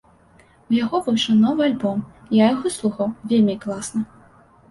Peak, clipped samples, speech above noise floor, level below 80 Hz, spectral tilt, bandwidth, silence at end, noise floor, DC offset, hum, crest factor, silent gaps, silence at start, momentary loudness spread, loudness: -4 dBFS; under 0.1%; 33 dB; -58 dBFS; -5.5 dB/octave; 11.5 kHz; 0.65 s; -53 dBFS; under 0.1%; none; 16 dB; none; 0.7 s; 10 LU; -20 LUFS